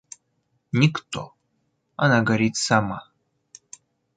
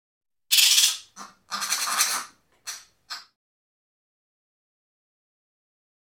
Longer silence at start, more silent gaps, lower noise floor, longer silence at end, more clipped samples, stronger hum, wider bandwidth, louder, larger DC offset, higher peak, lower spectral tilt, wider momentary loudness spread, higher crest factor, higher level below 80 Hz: first, 0.75 s vs 0.5 s; neither; first, -72 dBFS vs -47 dBFS; second, 1.15 s vs 2.85 s; neither; neither; second, 9.4 kHz vs 17.5 kHz; about the same, -22 LUFS vs -20 LUFS; neither; second, -4 dBFS vs 0 dBFS; first, -5 dB/octave vs 4 dB/octave; second, 17 LU vs 23 LU; second, 22 dB vs 28 dB; first, -58 dBFS vs -82 dBFS